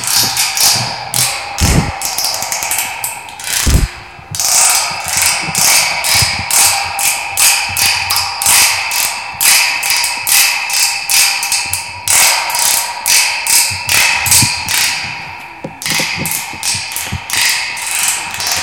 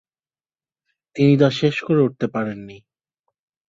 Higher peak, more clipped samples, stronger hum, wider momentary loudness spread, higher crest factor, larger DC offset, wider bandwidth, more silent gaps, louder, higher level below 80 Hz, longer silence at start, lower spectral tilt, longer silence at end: about the same, 0 dBFS vs -2 dBFS; first, 0.2% vs under 0.1%; neither; second, 9 LU vs 16 LU; second, 14 dB vs 20 dB; first, 0.2% vs under 0.1%; first, over 20 kHz vs 7.6 kHz; neither; first, -11 LUFS vs -19 LUFS; first, -30 dBFS vs -60 dBFS; second, 0 s vs 1.15 s; second, -0.5 dB/octave vs -7.5 dB/octave; second, 0 s vs 0.9 s